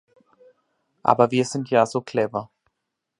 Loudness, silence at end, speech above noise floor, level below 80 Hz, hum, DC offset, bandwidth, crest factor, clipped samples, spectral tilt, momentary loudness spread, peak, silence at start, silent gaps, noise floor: -22 LUFS; 0.75 s; 60 dB; -68 dBFS; none; under 0.1%; 11 kHz; 24 dB; under 0.1%; -5.5 dB/octave; 7 LU; 0 dBFS; 1.05 s; none; -81 dBFS